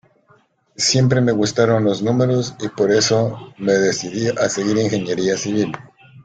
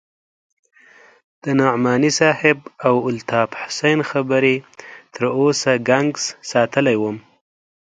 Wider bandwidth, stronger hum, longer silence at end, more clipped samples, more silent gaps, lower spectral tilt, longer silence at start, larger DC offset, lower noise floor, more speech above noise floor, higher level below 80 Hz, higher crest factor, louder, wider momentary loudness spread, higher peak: about the same, 9.4 kHz vs 9.4 kHz; neither; second, 0.05 s vs 0.65 s; neither; neither; about the same, -5 dB/octave vs -4.5 dB/octave; second, 0.8 s vs 1.45 s; neither; first, -56 dBFS vs -49 dBFS; first, 39 dB vs 31 dB; first, -54 dBFS vs -62 dBFS; about the same, 16 dB vs 18 dB; about the same, -18 LUFS vs -18 LUFS; about the same, 7 LU vs 9 LU; about the same, -2 dBFS vs 0 dBFS